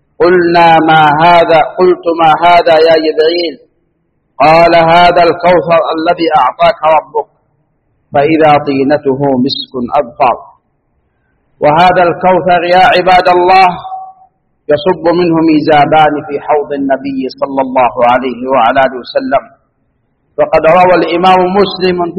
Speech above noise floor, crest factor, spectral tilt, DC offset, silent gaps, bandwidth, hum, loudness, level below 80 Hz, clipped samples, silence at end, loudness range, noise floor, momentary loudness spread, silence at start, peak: 51 dB; 8 dB; -7 dB/octave; under 0.1%; none; 8.6 kHz; none; -8 LUFS; -40 dBFS; 0.6%; 0 s; 4 LU; -59 dBFS; 9 LU; 0.2 s; 0 dBFS